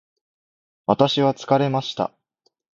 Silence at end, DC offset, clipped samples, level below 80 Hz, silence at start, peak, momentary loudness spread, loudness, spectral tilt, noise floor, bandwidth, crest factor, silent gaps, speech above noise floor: 0.75 s; under 0.1%; under 0.1%; -62 dBFS; 0.9 s; 0 dBFS; 10 LU; -21 LUFS; -6.5 dB/octave; -69 dBFS; 7.6 kHz; 22 dB; none; 50 dB